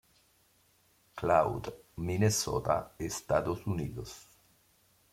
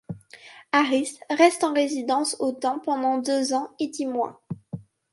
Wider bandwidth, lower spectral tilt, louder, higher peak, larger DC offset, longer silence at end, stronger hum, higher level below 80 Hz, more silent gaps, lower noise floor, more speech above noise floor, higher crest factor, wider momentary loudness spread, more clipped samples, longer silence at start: first, 16.5 kHz vs 11.5 kHz; about the same, -5 dB/octave vs -4 dB/octave; second, -32 LUFS vs -24 LUFS; second, -12 dBFS vs -4 dBFS; neither; first, 0.9 s vs 0.3 s; neither; first, -56 dBFS vs -70 dBFS; neither; first, -68 dBFS vs -48 dBFS; first, 37 dB vs 25 dB; about the same, 22 dB vs 20 dB; about the same, 16 LU vs 18 LU; neither; first, 1.15 s vs 0.1 s